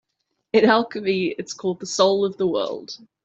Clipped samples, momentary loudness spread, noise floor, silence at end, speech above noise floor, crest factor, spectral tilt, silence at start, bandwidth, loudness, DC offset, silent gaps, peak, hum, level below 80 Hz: under 0.1%; 11 LU; -76 dBFS; 0.3 s; 55 dB; 20 dB; -4.5 dB/octave; 0.55 s; 8.2 kHz; -21 LUFS; under 0.1%; none; -2 dBFS; none; -66 dBFS